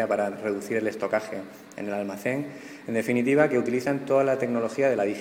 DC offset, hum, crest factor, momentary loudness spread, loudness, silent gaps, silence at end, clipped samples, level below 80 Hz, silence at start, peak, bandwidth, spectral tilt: under 0.1%; none; 20 dB; 14 LU; -26 LUFS; none; 0 s; under 0.1%; -70 dBFS; 0 s; -6 dBFS; 16.5 kHz; -6.5 dB/octave